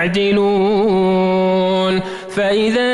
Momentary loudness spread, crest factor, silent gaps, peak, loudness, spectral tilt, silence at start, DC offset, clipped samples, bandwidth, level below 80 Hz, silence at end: 5 LU; 8 dB; none; -6 dBFS; -15 LUFS; -6.5 dB/octave; 0 s; under 0.1%; under 0.1%; 11.5 kHz; -48 dBFS; 0 s